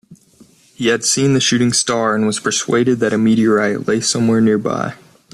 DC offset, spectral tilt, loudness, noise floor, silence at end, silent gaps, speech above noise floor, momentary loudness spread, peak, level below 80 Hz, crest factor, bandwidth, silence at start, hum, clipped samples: under 0.1%; -4 dB/octave; -15 LUFS; -49 dBFS; 0.4 s; none; 34 dB; 5 LU; -2 dBFS; -56 dBFS; 14 dB; 13 kHz; 0.1 s; none; under 0.1%